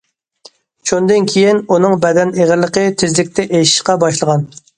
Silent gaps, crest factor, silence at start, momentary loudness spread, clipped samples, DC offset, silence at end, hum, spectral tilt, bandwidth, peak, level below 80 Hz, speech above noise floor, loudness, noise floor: none; 14 dB; 0.85 s; 4 LU; under 0.1%; under 0.1%; 0.3 s; none; -4.5 dB/octave; 11 kHz; 0 dBFS; -52 dBFS; 33 dB; -13 LUFS; -45 dBFS